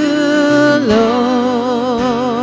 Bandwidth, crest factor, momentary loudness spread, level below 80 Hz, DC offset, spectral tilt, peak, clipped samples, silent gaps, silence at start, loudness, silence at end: 8 kHz; 12 dB; 5 LU; -44 dBFS; under 0.1%; -5.5 dB/octave; 0 dBFS; under 0.1%; none; 0 s; -13 LUFS; 0 s